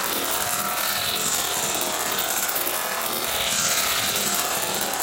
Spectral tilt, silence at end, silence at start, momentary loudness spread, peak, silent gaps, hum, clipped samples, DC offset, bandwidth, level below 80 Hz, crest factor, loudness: -0.5 dB/octave; 0 s; 0 s; 3 LU; -8 dBFS; none; none; under 0.1%; under 0.1%; 17.5 kHz; -54 dBFS; 16 dB; -22 LUFS